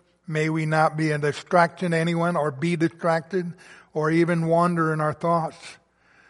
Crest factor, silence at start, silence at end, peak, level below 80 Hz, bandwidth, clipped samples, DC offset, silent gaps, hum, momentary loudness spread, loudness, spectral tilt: 20 dB; 0.3 s; 0.55 s; -4 dBFS; -66 dBFS; 11.5 kHz; under 0.1%; under 0.1%; none; none; 9 LU; -23 LUFS; -7 dB/octave